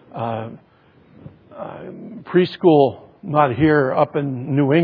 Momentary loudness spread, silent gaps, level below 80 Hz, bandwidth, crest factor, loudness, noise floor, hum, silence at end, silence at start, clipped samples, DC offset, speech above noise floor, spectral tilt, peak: 20 LU; none; -56 dBFS; 5 kHz; 18 dB; -18 LUFS; -51 dBFS; none; 0 s; 0.15 s; under 0.1%; under 0.1%; 33 dB; -10.5 dB/octave; -2 dBFS